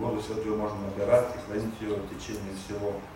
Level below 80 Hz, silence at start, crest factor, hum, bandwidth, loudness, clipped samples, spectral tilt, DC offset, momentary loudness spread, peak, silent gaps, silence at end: -50 dBFS; 0 s; 20 dB; none; 16 kHz; -31 LUFS; under 0.1%; -6 dB/octave; under 0.1%; 12 LU; -10 dBFS; none; 0 s